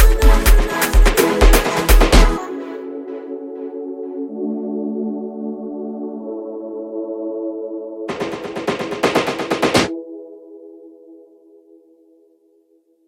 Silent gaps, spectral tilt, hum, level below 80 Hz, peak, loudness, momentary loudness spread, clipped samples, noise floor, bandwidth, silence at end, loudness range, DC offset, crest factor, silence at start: none; -4.5 dB/octave; none; -20 dBFS; 0 dBFS; -19 LUFS; 15 LU; under 0.1%; -58 dBFS; 16.5 kHz; 1.9 s; 10 LU; under 0.1%; 18 dB; 0 s